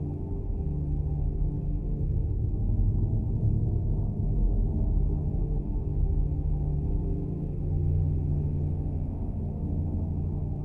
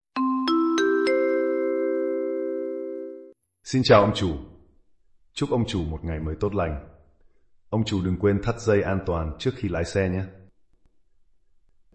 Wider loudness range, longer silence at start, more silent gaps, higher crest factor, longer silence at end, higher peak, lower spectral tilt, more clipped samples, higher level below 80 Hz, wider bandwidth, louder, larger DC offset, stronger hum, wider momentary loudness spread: second, 2 LU vs 5 LU; second, 0 s vs 0.15 s; neither; second, 12 dB vs 18 dB; second, 0 s vs 1.55 s; second, -14 dBFS vs -6 dBFS; first, -13 dB/octave vs -6.5 dB/octave; neither; first, -30 dBFS vs -46 dBFS; second, 1.2 kHz vs 8.8 kHz; second, -30 LUFS vs -24 LUFS; neither; neither; second, 5 LU vs 12 LU